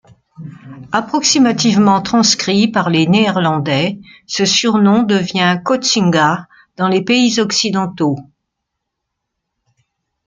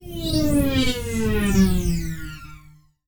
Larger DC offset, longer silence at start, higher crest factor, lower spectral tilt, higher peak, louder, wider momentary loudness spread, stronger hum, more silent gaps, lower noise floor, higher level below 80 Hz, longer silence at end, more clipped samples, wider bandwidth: neither; first, 0.4 s vs 0 s; about the same, 14 dB vs 16 dB; second, -4 dB/octave vs -5.5 dB/octave; first, 0 dBFS vs -6 dBFS; first, -13 LUFS vs -22 LUFS; second, 9 LU vs 15 LU; neither; neither; first, -76 dBFS vs -50 dBFS; second, -56 dBFS vs -30 dBFS; first, 2.05 s vs 0.5 s; neither; second, 9.4 kHz vs over 20 kHz